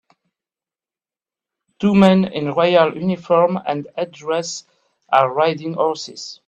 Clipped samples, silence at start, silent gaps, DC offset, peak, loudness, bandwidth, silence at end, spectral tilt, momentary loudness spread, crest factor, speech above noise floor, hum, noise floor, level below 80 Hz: under 0.1%; 1.8 s; none; under 0.1%; 0 dBFS; -18 LUFS; 8.4 kHz; 0.15 s; -6 dB/octave; 13 LU; 18 dB; over 73 dB; none; under -90 dBFS; -58 dBFS